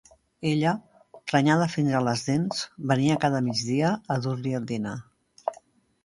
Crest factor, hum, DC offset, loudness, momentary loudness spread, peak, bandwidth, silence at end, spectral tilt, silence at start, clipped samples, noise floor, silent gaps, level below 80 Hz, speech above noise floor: 20 dB; none; under 0.1%; -26 LUFS; 13 LU; -6 dBFS; 11.5 kHz; 0.5 s; -6 dB/octave; 0.4 s; under 0.1%; -56 dBFS; none; -62 dBFS; 32 dB